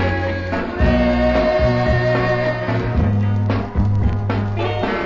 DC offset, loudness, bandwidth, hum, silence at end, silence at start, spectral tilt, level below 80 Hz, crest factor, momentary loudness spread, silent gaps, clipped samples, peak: under 0.1%; -18 LUFS; 7.4 kHz; none; 0 s; 0 s; -8.5 dB/octave; -26 dBFS; 14 dB; 5 LU; none; under 0.1%; -2 dBFS